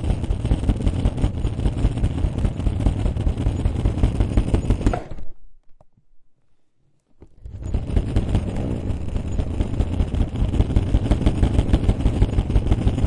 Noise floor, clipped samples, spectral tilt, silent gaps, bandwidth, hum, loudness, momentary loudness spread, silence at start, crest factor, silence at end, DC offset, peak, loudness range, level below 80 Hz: -60 dBFS; under 0.1%; -8 dB/octave; none; 10.5 kHz; none; -23 LUFS; 6 LU; 0 s; 18 dB; 0 s; under 0.1%; -4 dBFS; 7 LU; -24 dBFS